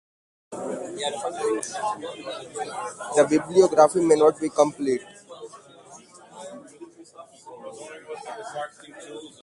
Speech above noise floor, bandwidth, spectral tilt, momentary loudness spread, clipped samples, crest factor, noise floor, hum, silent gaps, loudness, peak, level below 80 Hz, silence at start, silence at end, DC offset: 24 dB; 11.5 kHz; -4.5 dB/octave; 24 LU; under 0.1%; 22 dB; -48 dBFS; none; none; -23 LUFS; -4 dBFS; -68 dBFS; 0.5 s; 0.15 s; under 0.1%